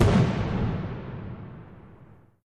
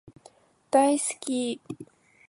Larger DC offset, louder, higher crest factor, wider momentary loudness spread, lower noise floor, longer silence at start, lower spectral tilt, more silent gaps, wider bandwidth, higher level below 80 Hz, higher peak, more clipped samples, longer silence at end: first, 0.1% vs under 0.1%; about the same, -27 LUFS vs -25 LUFS; about the same, 20 dB vs 20 dB; first, 24 LU vs 19 LU; second, -52 dBFS vs -57 dBFS; second, 0 s vs 0.75 s; first, -7.5 dB/octave vs -3 dB/octave; neither; about the same, 11 kHz vs 11.5 kHz; first, -38 dBFS vs -74 dBFS; about the same, -6 dBFS vs -8 dBFS; neither; second, 0.3 s vs 0.45 s